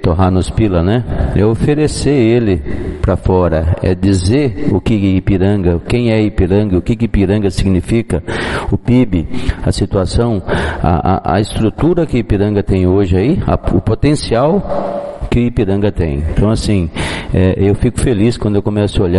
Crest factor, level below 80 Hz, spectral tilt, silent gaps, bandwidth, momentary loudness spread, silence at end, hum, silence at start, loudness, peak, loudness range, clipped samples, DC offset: 12 dB; -24 dBFS; -7 dB/octave; none; 11.5 kHz; 5 LU; 0 s; none; 0 s; -14 LUFS; 0 dBFS; 2 LU; under 0.1%; under 0.1%